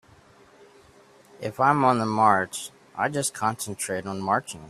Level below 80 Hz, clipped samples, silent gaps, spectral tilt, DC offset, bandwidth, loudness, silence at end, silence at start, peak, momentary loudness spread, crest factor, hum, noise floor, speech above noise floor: -66 dBFS; under 0.1%; none; -4.5 dB/octave; under 0.1%; 15 kHz; -24 LUFS; 0 s; 1.4 s; -6 dBFS; 15 LU; 20 dB; none; -54 dBFS; 30 dB